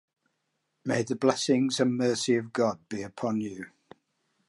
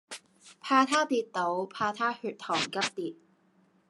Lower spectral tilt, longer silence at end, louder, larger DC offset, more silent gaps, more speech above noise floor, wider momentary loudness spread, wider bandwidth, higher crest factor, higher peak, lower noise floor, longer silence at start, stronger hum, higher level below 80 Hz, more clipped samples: first, -4.5 dB/octave vs -3 dB/octave; about the same, 0.8 s vs 0.75 s; about the same, -28 LUFS vs -29 LUFS; neither; neither; first, 51 dB vs 37 dB; second, 13 LU vs 16 LU; about the same, 11.5 kHz vs 12 kHz; about the same, 20 dB vs 24 dB; about the same, -10 dBFS vs -8 dBFS; first, -79 dBFS vs -66 dBFS; first, 0.85 s vs 0.1 s; neither; first, -72 dBFS vs -82 dBFS; neither